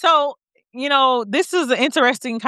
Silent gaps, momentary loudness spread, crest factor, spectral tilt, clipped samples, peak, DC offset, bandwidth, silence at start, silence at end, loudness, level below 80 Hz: none; 5 LU; 18 dB; -2.5 dB/octave; under 0.1%; -2 dBFS; under 0.1%; 14 kHz; 0 s; 0 s; -18 LUFS; -78 dBFS